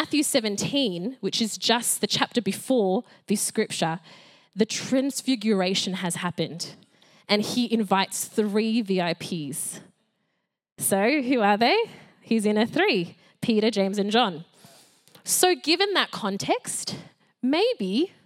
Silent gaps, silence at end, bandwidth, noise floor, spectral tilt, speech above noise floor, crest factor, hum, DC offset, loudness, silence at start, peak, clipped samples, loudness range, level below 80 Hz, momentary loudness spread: 10.72-10.76 s; 0.2 s; 16.5 kHz; -77 dBFS; -3.5 dB/octave; 52 dB; 22 dB; none; under 0.1%; -24 LUFS; 0 s; -4 dBFS; under 0.1%; 3 LU; -76 dBFS; 10 LU